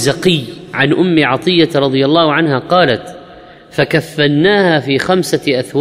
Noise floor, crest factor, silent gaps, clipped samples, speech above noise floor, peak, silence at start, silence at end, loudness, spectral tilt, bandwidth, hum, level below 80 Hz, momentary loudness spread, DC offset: -37 dBFS; 12 dB; none; under 0.1%; 25 dB; 0 dBFS; 0 s; 0 s; -12 LUFS; -5.5 dB/octave; 15.5 kHz; none; -48 dBFS; 7 LU; under 0.1%